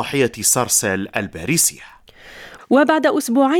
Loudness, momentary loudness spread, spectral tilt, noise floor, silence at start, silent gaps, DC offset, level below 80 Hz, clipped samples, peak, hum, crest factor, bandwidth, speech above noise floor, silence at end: -17 LUFS; 9 LU; -3 dB/octave; -42 dBFS; 0 s; none; under 0.1%; -52 dBFS; under 0.1%; 0 dBFS; none; 18 dB; 18 kHz; 25 dB; 0 s